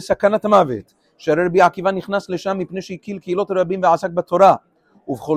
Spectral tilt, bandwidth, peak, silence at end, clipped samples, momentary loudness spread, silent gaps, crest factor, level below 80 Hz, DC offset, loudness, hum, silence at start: -6.5 dB/octave; 14 kHz; 0 dBFS; 0 s; under 0.1%; 15 LU; none; 18 dB; -56 dBFS; under 0.1%; -17 LUFS; none; 0 s